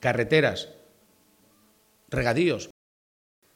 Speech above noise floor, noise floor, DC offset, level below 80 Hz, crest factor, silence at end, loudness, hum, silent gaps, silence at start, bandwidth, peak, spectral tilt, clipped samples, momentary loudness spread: 38 dB; -62 dBFS; under 0.1%; -52 dBFS; 22 dB; 0.9 s; -25 LUFS; none; none; 0 s; 16.5 kHz; -6 dBFS; -5.5 dB/octave; under 0.1%; 17 LU